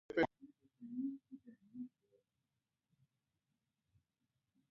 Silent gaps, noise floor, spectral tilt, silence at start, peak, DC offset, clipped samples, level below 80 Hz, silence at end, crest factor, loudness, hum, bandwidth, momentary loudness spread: none; -90 dBFS; -4 dB/octave; 0.1 s; -22 dBFS; under 0.1%; under 0.1%; -78 dBFS; 2.85 s; 26 dB; -44 LUFS; none; 4 kHz; 22 LU